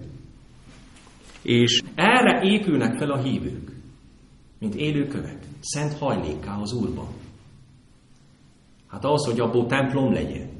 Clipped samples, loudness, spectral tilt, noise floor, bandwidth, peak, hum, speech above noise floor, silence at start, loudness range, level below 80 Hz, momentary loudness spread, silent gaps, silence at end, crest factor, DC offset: under 0.1%; -23 LUFS; -5 dB/octave; -54 dBFS; 11.5 kHz; -4 dBFS; none; 31 dB; 0 s; 9 LU; -48 dBFS; 17 LU; none; 0 s; 20 dB; under 0.1%